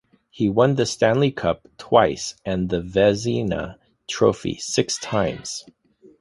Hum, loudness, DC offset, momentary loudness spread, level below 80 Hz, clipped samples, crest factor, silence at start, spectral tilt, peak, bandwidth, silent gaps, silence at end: none; -21 LUFS; under 0.1%; 13 LU; -48 dBFS; under 0.1%; 20 dB; 0.35 s; -5 dB/octave; -2 dBFS; 11.5 kHz; none; 0.6 s